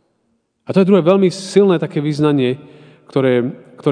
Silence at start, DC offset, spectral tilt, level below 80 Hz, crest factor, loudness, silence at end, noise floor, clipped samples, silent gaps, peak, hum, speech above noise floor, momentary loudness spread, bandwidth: 0.7 s; under 0.1%; -7 dB/octave; -66 dBFS; 16 dB; -15 LUFS; 0 s; -65 dBFS; under 0.1%; none; 0 dBFS; none; 51 dB; 10 LU; 10 kHz